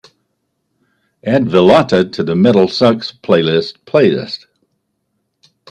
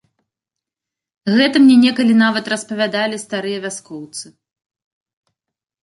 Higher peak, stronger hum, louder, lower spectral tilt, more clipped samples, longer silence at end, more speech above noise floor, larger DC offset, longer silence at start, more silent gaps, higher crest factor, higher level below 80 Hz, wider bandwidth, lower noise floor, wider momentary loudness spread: about the same, 0 dBFS vs -2 dBFS; neither; first, -12 LUFS vs -15 LUFS; first, -7 dB/octave vs -4.5 dB/octave; neither; second, 1.35 s vs 1.6 s; second, 57 dB vs 71 dB; neither; about the same, 1.25 s vs 1.25 s; neither; about the same, 14 dB vs 16 dB; first, -54 dBFS vs -66 dBFS; second, 10 kHz vs 11.5 kHz; second, -69 dBFS vs -86 dBFS; second, 11 LU vs 19 LU